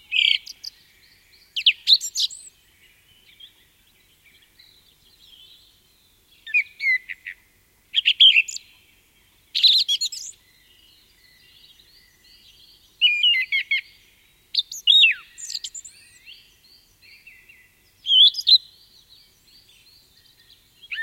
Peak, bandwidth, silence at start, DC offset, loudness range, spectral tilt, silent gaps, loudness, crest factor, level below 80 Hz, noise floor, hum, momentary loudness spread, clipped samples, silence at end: -4 dBFS; 16.5 kHz; 0.1 s; under 0.1%; 9 LU; 4.5 dB/octave; none; -17 LUFS; 22 dB; -68 dBFS; -60 dBFS; none; 23 LU; under 0.1%; 0 s